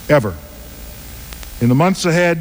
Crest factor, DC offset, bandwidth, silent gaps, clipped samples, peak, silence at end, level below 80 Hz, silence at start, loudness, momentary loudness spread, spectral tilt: 14 dB; under 0.1%; over 20 kHz; none; under 0.1%; -2 dBFS; 0 s; -36 dBFS; 0 s; -15 LUFS; 19 LU; -6 dB/octave